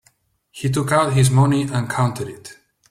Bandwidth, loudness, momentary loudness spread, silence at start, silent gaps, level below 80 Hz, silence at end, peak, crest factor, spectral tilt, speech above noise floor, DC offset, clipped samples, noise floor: 14.5 kHz; -18 LUFS; 15 LU; 0.55 s; none; -50 dBFS; 0.35 s; -4 dBFS; 16 dB; -6 dB/octave; 43 dB; under 0.1%; under 0.1%; -61 dBFS